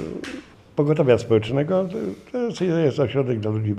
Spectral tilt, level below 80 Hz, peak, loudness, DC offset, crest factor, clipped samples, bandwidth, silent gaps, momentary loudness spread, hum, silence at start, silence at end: -7.5 dB/octave; -56 dBFS; -4 dBFS; -22 LUFS; under 0.1%; 18 dB; under 0.1%; 10.5 kHz; none; 13 LU; none; 0 s; 0 s